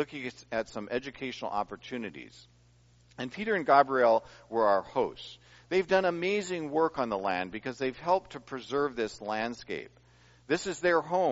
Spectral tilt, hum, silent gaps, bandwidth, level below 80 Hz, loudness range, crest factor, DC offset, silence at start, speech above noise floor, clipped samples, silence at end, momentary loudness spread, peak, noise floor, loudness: -3 dB/octave; none; none; 7.6 kHz; -64 dBFS; 6 LU; 22 dB; under 0.1%; 0 s; 32 dB; under 0.1%; 0 s; 15 LU; -10 dBFS; -62 dBFS; -30 LUFS